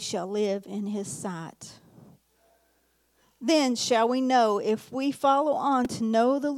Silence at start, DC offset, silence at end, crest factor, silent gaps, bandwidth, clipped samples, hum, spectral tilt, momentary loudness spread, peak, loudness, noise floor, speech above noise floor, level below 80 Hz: 0 s; under 0.1%; 0 s; 16 dB; none; 15.5 kHz; under 0.1%; none; -4 dB/octave; 12 LU; -10 dBFS; -26 LUFS; -69 dBFS; 43 dB; -70 dBFS